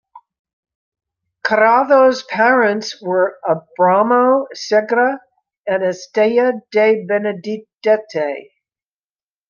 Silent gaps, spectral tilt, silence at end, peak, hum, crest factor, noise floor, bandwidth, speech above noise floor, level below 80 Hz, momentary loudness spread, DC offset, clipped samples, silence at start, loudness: 0.39-0.45 s, 0.53-0.63 s, 0.75-0.92 s, 5.58-5.64 s; -5 dB/octave; 1.05 s; -2 dBFS; none; 16 dB; under -90 dBFS; 7.2 kHz; over 75 dB; -68 dBFS; 10 LU; under 0.1%; under 0.1%; 0.15 s; -16 LUFS